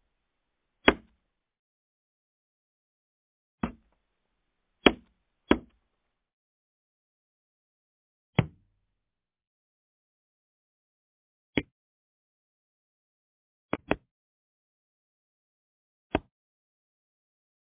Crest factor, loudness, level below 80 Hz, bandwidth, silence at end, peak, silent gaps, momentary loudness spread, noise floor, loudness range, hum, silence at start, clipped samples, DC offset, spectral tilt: 34 dB; -29 LUFS; -54 dBFS; 3.9 kHz; 1.55 s; -2 dBFS; 1.59-3.58 s, 6.33-8.33 s, 9.47-11.53 s, 11.72-13.69 s, 14.11-16.10 s; 13 LU; -88 dBFS; 11 LU; none; 0.85 s; under 0.1%; under 0.1%; -3.5 dB/octave